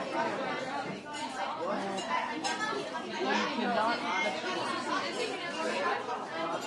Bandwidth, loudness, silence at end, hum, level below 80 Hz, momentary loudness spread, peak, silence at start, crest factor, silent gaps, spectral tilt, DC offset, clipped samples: 12 kHz; -33 LUFS; 0 s; none; -78 dBFS; 6 LU; -18 dBFS; 0 s; 16 dB; none; -3 dB/octave; under 0.1%; under 0.1%